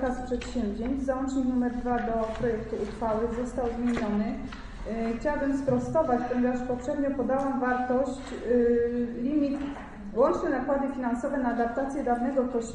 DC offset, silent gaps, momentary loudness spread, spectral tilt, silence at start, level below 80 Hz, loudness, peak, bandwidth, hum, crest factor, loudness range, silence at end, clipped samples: under 0.1%; none; 7 LU; -7 dB/octave; 0 s; -44 dBFS; -28 LUFS; -12 dBFS; 9.4 kHz; none; 16 dB; 3 LU; 0 s; under 0.1%